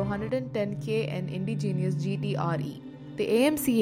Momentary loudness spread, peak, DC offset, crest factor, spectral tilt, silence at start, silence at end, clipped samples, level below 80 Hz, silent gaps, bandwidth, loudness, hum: 9 LU; -10 dBFS; under 0.1%; 18 dB; -6.5 dB/octave; 0 s; 0 s; under 0.1%; -58 dBFS; none; 16 kHz; -29 LUFS; none